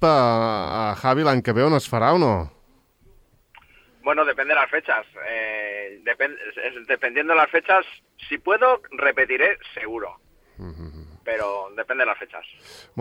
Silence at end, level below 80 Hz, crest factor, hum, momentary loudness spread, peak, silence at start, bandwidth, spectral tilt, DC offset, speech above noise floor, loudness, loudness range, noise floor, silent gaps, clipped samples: 0 s; -54 dBFS; 18 dB; none; 19 LU; -4 dBFS; 0 s; 16.5 kHz; -6 dB/octave; under 0.1%; 36 dB; -21 LUFS; 4 LU; -58 dBFS; none; under 0.1%